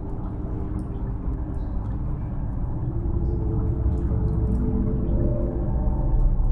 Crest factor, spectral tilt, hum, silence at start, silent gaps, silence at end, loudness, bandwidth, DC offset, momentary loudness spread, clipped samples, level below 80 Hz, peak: 14 dB; -12 dB/octave; none; 0 s; none; 0 s; -27 LUFS; 2.3 kHz; under 0.1%; 6 LU; under 0.1%; -26 dBFS; -10 dBFS